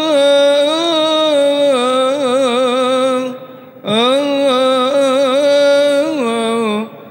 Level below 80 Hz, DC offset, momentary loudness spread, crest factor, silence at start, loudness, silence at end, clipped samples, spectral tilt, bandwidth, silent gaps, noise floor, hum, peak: -68 dBFS; under 0.1%; 7 LU; 12 dB; 0 s; -13 LUFS; 0 s; under 0.1%; -3.5 dB/octave; 16.5 kHz; none; -33 dBFS; none; -2 dBFS